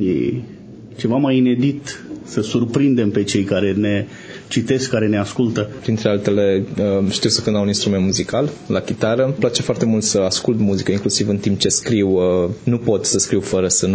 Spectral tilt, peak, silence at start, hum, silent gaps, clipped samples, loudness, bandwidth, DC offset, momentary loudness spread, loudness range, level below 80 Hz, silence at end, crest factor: -5 dB/octave; -2 dBFS; 0 s; none; none; under 0.1%; -18 LUFS; 8 kHz; under 0.1%; 7 LU; 2 LU; -44 dBFS; 0 s; 16 dB